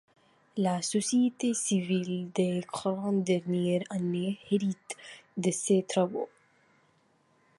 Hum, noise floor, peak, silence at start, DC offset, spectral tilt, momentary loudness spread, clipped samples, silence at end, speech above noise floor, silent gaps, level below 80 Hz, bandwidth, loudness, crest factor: none; -68 dBFS; -14 dBFS; 0.55 s; under 0.1%; -5.5 dB/octave; 11 LU; under 0.1%; 1.3 s; 39 dB; none; -76 dBFS; 11.5 kHz; -30 LUFS; 18 dB